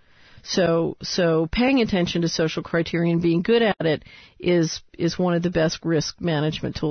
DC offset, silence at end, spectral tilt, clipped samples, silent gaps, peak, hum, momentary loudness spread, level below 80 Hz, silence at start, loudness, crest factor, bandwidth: under 0.1%; 0 s; -5.5 dB/octave; under 0.1%; none; -8 dBFS; none; 7 LU; -46 dBFS; 0.45 s; -22 LUFS; 14 dB; 6.6 kHz